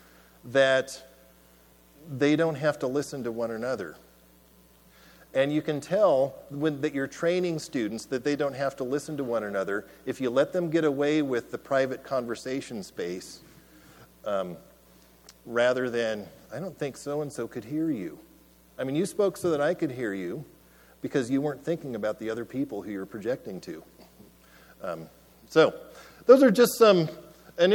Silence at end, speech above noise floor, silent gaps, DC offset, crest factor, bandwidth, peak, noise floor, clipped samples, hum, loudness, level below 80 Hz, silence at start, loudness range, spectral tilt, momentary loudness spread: 0 s; 31 dB; none; under 0.1%; 24 dB; 19 kHz; -4 dBFS; -58 dBFS; under 0.1%; none; -27 LUFS; -64 dBFS; 0.45 s; 7 LU; -5.5 dB/octave; 16 LU